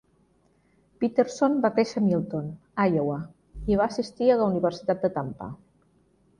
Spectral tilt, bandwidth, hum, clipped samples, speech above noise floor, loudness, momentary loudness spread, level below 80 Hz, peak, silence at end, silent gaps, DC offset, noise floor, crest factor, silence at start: -7 dB/octave; 10.5 kHz; none; under 0.1%; 40 dB; -26 LUFS; 13 LU; -52 dBFS; -8 dBFS; 0.85 s; none; under 0.1%; -65 dBFS; 18 dB; 1 s